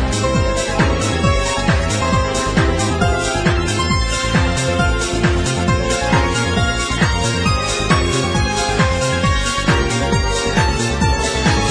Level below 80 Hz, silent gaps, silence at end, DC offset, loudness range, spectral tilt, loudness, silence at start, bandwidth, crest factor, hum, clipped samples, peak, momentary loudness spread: -24 dBFS; none; 0 s; under 0.1%; 0 LU; -4.5 dB/octave; -16 LUFS; 0 s; 11 kHz; 14 dB; none; under 0.1%; -2 dBFS; 1 LU